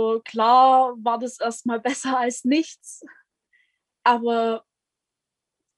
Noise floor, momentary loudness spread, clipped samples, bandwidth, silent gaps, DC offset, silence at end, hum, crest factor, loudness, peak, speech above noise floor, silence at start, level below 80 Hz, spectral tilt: -86 dBFS; 14 LU; under 0.1%; 12 kHz; none; under 0.1%; 1.2 s; none; 18 dB; -21 LUFS; -6 dBFS; 65 dB; 0 s; -78 dBFS; -3 dB/octave